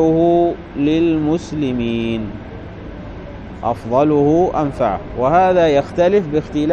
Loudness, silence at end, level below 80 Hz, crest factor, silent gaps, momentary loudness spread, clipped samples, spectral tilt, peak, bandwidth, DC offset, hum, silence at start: -16 LUFS; 0 s; -38 dBFS; 14 dB; none; 19 LU; under 0.1%; -7.5 dB/octave; -2 dBFS; 8 kHz; under 0.1%; none; 0 s